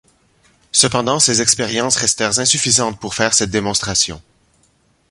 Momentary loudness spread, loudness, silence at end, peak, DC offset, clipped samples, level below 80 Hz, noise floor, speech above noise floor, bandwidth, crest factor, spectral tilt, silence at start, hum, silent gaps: 5 LU; -14 LUFS; 0.9 s; 0 dBFS; under 0.1%; under 0.1%; -46 dBFS; -58 dBFS; 42 dB; 16 kHz; 18 dB; -2 dB/octave; 0.75 s; none; none